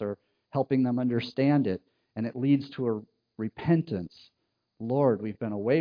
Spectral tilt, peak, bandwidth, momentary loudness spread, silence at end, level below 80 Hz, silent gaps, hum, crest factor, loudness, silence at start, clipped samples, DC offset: -10 dB/octave; -10 dBFS; 5.2 kHz; 12 LU; 0 s; -66 dBFS; none; none; 18 dB; -28 LUFS; 0 s; under 0.1%; under 0.1%